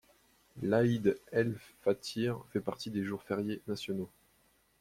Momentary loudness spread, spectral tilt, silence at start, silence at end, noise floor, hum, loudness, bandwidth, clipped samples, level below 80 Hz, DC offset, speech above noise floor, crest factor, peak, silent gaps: 9 LU; -6.5 dB/octave; 0.55 s; 0.75 s; -70 dBFS; none; -34 LUFS; 16 kHz; under 0.1%; -68 dBFS; under 0.1%; 37 dB; 20 dB; -14 dBFS; none